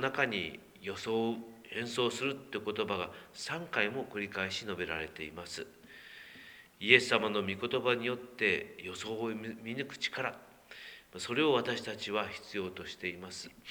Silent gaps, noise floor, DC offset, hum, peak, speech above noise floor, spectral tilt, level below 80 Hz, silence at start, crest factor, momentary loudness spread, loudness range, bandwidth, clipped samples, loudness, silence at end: none; -55 dBFS; under 0.1%; none; -6 dBFS; 20 dB; -4 dB/octave; -70 dBFS; 0 s; 30 dB; 18 LU; 6 LU; over 20 kHz; under 0.1%; -34 LUFS; 0 s